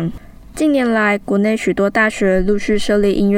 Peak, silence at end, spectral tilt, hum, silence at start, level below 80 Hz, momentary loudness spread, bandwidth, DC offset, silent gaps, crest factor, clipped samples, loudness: -2 dBFS; 0 s; -6 dB/octave; none; 0 s; -34 dBFS; 3 LU; 15 kHz; under 0.1%; none; 12 dB; under 0.1%; -16 LUFS